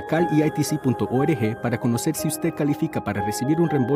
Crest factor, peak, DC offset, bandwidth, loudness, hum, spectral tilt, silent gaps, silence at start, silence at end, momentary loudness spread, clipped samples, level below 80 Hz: 14 dB; -8 dBFS; under 0.1%; 16 kHz; -23 LUFS; none; -6 dB/octave; none; 0 s; 0 s; 4 LU; under 0.1%; -54 dBFS